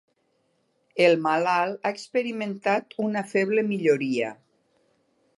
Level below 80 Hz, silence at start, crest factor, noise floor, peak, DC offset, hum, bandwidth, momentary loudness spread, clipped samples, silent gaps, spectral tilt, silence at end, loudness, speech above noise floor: -80 dBFS; 0.95 s; 22 dB; -70 dBFS; -4 dBFS; under 0.1%; none; 11.5 kHz; 9 LU; under 0.1%; none; -5.5 dB/octave; 1.05 s; -24 LUFS; 46 dB